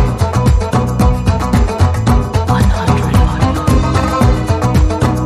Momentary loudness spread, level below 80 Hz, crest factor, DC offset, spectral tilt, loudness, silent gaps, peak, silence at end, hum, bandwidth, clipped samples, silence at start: 2 LU; -16 dBFS; 12 dB; under 0.1%; -7 dB/octave; -13 LUFS; none; 0 dBFS; 0 s; none; 15 kHz; under 0.1%; 0 s